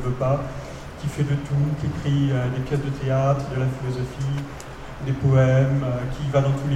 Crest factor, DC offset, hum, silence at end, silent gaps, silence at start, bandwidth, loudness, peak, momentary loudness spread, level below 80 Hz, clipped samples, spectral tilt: 16 dB; 0.2%; none; 0 s; none; 0 s; 9.2 kHz; -23 LUFS; -6 dBFS; 13 LU; -40 dBFS; under 0.1%; -8 dB/octave